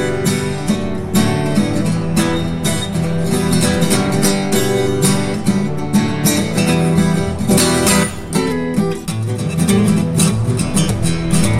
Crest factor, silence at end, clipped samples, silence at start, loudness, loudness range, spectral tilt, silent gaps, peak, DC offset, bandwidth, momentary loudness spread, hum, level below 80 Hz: 14 dB; 0 s; under 0.1%; 0 s; -16 LUFS; 2 LU; -5 dB/octave; none; -2 dBFS; under 0.1%; 16 kHz; 5 LU; none; -34 dBFS